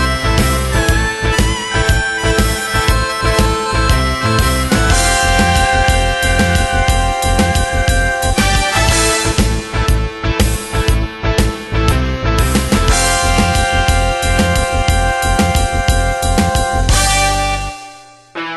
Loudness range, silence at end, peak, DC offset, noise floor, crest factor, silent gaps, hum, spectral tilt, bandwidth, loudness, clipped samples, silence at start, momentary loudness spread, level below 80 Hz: 2 LU; 0 s; 0 dBFS; under 0.1%; -37 dBFS; 14 dB; none; none; -4 dB/octave; 12.5 kHz; -14 LUFS; under 0.1%; 0 s; 5 LU; -18 dBFS